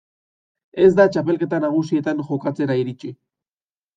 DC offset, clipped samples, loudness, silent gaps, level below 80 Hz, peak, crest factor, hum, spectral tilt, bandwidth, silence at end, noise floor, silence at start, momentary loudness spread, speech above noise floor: under 0.1%; under 0.1%; -19 LUFS; none; -60 dBFS; -2 dBFS; 18 dB; none; -8 dB/octave; 7.6 kHz; 0.8 s; under -90 dBFS; 0.75 s; 16 LU; over 71 dB